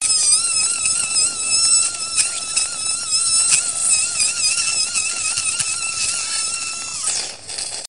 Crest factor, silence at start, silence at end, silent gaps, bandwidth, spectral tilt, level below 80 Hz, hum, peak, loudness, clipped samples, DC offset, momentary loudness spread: 20 dB; 0 s; 0 s; none; 10.5 kHz; 2.5 dB/octave; -56 dBFS; none; 0 dBFS; -16 LUFS; under 0.1%; 0.5%; 8 LU